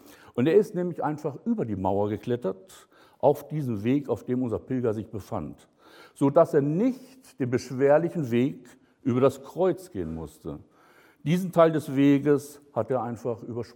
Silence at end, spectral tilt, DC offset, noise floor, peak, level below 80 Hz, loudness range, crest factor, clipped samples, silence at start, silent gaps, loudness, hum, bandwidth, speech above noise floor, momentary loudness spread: 0.1 s; -8 dB/octave; under 0.1%; -58 dBFS; -6 dBFS; -60 dBFS; 4 LU; 20 dB; under 0.1%; 0.35 s; none; -26 LUFS; none; 17 kHz; 32 dB; 14 LU